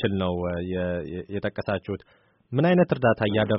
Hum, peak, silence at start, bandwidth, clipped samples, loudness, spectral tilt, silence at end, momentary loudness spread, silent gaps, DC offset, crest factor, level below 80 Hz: none; -8 dBFS; 0 s; 5.6 kHz; under 0.1%; -25 LUFS; -6 dB/octave; 0 s; 12 LU; none; under 0.1%; 18 dB; -52 dBFS